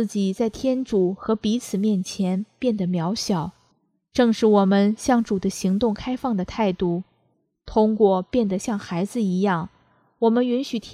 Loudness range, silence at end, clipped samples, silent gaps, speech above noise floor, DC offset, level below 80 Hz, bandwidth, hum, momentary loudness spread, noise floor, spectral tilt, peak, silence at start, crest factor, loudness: 2 LU; 0 s; under 0.1%; none; 47 dB; under 0.1%; -52 dBFS; 13.5 kHz; none; 8 LU; -68 dBFS; -6.5 dB/octave; -4 dBFS; 0 s; 18 dB; -22 LUFS